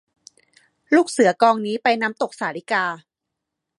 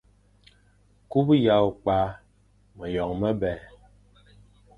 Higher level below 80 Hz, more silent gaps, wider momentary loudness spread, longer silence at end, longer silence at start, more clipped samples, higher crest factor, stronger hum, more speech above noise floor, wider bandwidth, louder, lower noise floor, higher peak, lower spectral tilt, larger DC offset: second, -78 dBFS vs -50 dBFS; neither; about the same, 11 LU vs 12 LU; second, 0.8 s vs 1.15 s; second, 0.9 s vs 1.1 s; neither; about the same, 20 dB vs 20 dB; second, none vs 50 Hz at -50 dBFS; first, 63 dB vs 38 dB; first, 11.5 kHz vs 5 kHz; first, -20 LUFS vs -24 LUFS; first, -82 dBFS vs -61 dBFS; first, -2 dBFS vs -8 dBFS; second, -4 dB/octave vs -9 dB/octave; neither